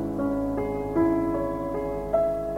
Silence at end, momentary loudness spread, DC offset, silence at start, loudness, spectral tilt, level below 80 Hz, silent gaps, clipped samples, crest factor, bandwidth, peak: 0 s; 6 LU; 0.1%; 0 s; -26 LUFS; -9 dB/octave; -42 dBFS; none; under 0.1%; 14 dB; 16 kHz; -10 dBFS